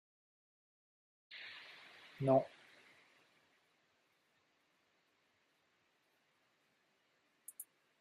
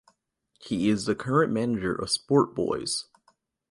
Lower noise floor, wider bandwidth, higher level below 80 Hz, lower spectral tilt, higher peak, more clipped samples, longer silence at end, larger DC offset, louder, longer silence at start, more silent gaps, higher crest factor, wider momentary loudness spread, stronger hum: first, -78 dBFS vs -72 dBFS; first, 13.5 kHz vs 11.5 kHz; second, -86 dBFS vs -58 dBFS; about the same, -6 dB/octave vs -5 dB/octave; second, -20 dBFS vs -10 dBFS; neither; second, 0.4 s vs 0.7 s; neither; second, -38 LUFS vs -26 LUFS; first, 1.3 s vs 0.6 s; neither; first, 26 dB vs 18 dB; first, 24 LU vs 6 LU; neither